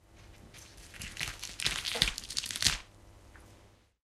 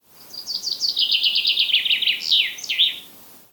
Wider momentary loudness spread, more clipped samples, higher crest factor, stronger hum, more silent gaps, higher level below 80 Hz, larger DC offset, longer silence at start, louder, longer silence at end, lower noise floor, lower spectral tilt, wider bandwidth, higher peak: first, 22 LU vs 12 LU; neither; first, 34 dB vs 16 dB; neither; neither; first, -52 dBFS vs -72 dBFS; neither; about the same, 0.1 s vs 0.2 s; second, -32 LUFS vs -18 LUFS; first, 0.35 s vs 0.15 s; first, -61 dBFS vs -45 dBFS; first, -0.5 dB/octave vs 2.5 dB/octave; second, 16 kHz vs 19 kHz; about the same, -4 dBFS vs -6 dBFS